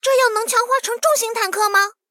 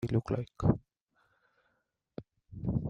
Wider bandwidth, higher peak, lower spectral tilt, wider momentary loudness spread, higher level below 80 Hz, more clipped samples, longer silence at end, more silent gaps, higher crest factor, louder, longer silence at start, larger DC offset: first, 17 kHz vs 8 kHz; first, -4 dBFS vs -12 dBFS; second, 2.5 dB/octave vs -9.5 dB/octave; second, 3 LU vs 19 LU; second, -76 dBFS vs -52 dBFS; neither; first, 0.2 s vs 0 s; second, none vs 1.01-1.07 s; second, 14 dB vs 24 dB; first, -17 LUFS vs -33 LUFS; about the same, 0.05 s vs 0 s; neither